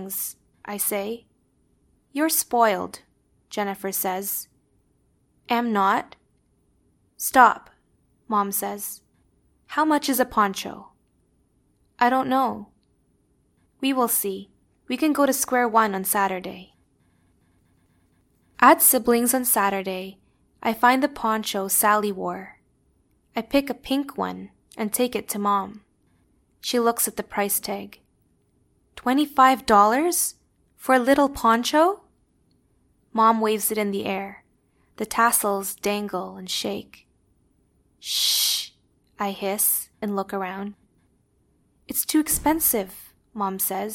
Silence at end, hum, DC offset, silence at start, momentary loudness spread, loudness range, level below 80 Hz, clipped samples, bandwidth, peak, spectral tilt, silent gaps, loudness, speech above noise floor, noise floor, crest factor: 0 s; none; under 0.1%; 0 s; 17 LU; 6 LU; -58 dBFS; under 0.1%; 17.5 kHz; 0 dBFS; -2.5 dB/octave; none; -22 LUFS; 43 dB; -65 dBFS; 24 dB